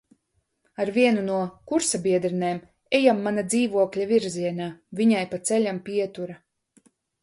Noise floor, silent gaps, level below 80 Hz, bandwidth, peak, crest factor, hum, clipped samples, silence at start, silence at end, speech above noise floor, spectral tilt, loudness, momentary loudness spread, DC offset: -73 dBFS; none; -66 dBFS; 11.5 kHz; -6 dBFS; 20 dB; none; under 0.1%; 0.8 s; 0.85 s; 50 dB; -4.5 dB/octave; -24 LUFS; 11 LU; under 0.1%